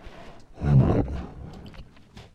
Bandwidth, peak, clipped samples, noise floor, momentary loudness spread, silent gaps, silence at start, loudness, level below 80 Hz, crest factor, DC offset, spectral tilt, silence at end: 6.2 kHz; -8 dBFS; under 0.1%; -48 dBFS; 25 LU; none; 0.05 s; -24 LUFS; -36 dBFS; 18 dB; under 0.1%; -10 dB/octave; 0.15 s